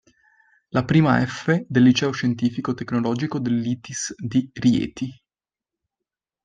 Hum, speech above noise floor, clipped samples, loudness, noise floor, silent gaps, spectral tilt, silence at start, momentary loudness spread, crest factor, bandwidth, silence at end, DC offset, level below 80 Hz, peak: none; over 69 dB; under 0.1%; -22 LUFS; under -90 dBFS; none; -6 dB/octave; 0.75 s; 11 LU; 18 dB; 9.4 kHz; 1.3 s; under 0.1%; -56 dBFS; -4 dBFS